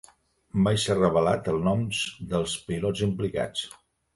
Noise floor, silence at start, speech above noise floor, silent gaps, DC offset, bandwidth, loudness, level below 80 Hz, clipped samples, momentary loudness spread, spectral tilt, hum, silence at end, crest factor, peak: -57 dBFS; 0.55 s; 32 dB; none; under 0.1%; 11.5 kHz; -26 LUFS; -50 dBFS; under 0.1%; 8 LU; -5.5 dB/octave; none; 0.45 s; 16 dB; -10 dBFS